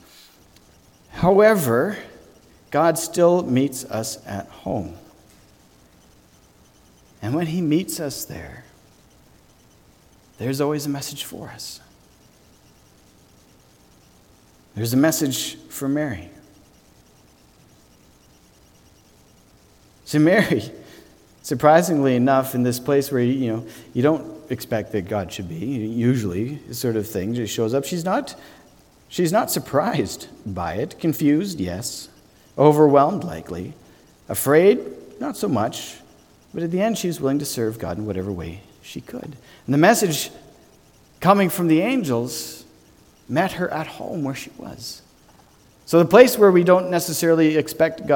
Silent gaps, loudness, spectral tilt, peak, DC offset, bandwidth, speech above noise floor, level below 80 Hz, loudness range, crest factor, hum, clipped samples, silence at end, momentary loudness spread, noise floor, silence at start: none; -20 LUFS; -5.5 dB/octave; 0 dBFS; under 0.1%; 19 kHz; 33 dB; -54 dBFS; 10 LU; 22 dB; none; under 0.1%; 0 s; 19 LU; -53 dBFS; 1.15 s